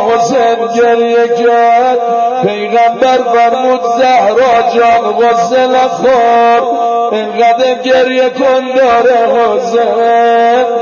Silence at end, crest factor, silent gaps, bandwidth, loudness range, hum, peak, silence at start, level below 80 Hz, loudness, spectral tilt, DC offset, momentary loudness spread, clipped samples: 0 s; 8 dB; none; 7.2 kHz; 1 LU; none; 0 dBFS; 0 s; -52 dBFS; -9 LUFS; -4 dB/octave; under 0.1%; 4 LU; under 0.1%